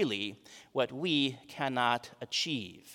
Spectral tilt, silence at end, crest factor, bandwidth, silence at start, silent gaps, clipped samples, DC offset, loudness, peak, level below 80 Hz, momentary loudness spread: -4 dB/octave; 0 s; 22 dB; 17.5 kHz; 0 s; none; under 0.1%; under 0.1%; -33 LUFS; -12 dBFS; -80 dBFS; 9 LU